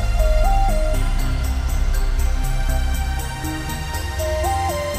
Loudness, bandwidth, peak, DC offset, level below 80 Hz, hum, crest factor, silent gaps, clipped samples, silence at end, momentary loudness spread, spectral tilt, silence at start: -23 LUFS; 15 kHz; -6 dBFS; under 0.1%; -20 dBFS; none; 14 dB; none; under 0.1%; 0 s; 6 LU; -5 dB/octave; 0 s